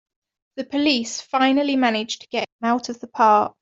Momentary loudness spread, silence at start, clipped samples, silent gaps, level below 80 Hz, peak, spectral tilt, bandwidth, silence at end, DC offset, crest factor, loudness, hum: 11 LU; 0.55 s; under 0.1%; 2.52-2.59 s; -66 dBFS; -4 dBFS; -3 dB/octave; 7.8 kHz; 0.1 s; under 0.1%; 18 dB; -20 LUFS; none